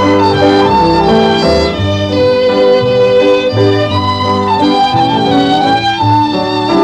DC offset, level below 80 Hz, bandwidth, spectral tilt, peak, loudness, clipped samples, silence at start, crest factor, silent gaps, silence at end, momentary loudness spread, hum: under 0.1%; -32 dBFS; 10 kHz; -6.5 dB/octave; 0 dBFS; -10 LUFS; under 0.1%; 0 s; 10 dB; none; 0 s; 4 LU; none